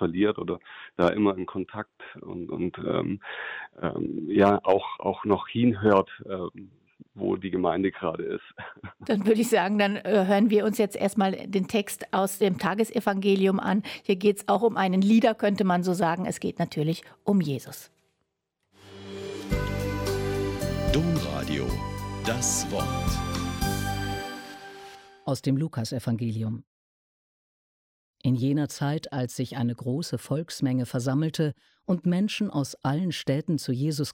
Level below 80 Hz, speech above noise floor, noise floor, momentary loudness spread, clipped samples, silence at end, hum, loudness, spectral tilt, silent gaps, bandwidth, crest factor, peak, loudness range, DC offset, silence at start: -46 dBFS; 53 dB; -79 dBFS; 14 LU; under 0.1%; 0 s; none; -27 LUFS; -5.5 dB/octave; 26.67-28.14 s; 16.5 kHz; 18 dB; -8 dBFS; 7 LU; under 0.1%; 0 s